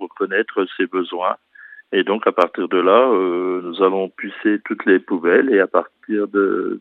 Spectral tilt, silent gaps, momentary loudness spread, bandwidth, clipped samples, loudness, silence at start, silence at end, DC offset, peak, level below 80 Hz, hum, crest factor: -7.5 dB/octave; none; 9 LU; 5.2 kHz; under 0.1%; -18 LUFS; 0 s; 0 s; under 0.1%; 0 dBFS; -78 dBFS; none; 18 dB